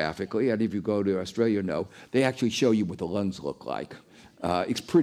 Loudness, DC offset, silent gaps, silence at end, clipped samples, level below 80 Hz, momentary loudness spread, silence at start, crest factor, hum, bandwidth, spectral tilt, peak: -28 LUFS; under 0.1%; none; 0 s; under 0.1%; -60 dBFS; 10 LU; 0 s; 16 dB; none; 15 kHz; -6 dB/octave; -12 dBFS